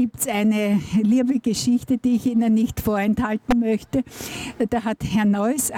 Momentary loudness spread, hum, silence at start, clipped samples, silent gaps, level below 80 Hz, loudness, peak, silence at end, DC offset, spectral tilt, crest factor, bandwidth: 6 LU; none; 0 s; under 0.1%; none; -44 dBFS; -21 LUFS; -10 dBFS; 0 s; under 0.1%; -5 dB/octave; 12 dB; 17 kHz